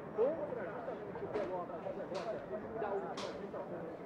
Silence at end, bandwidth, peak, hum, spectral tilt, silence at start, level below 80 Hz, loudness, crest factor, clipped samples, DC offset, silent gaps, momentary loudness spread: 0 s; 11 kHz; -24 dBFS; none; -6 dB/octave; 0 s; -70 dBFS; -41 LUFS; 18 dB; under 0.1%; under 0.1%; none; 8 LU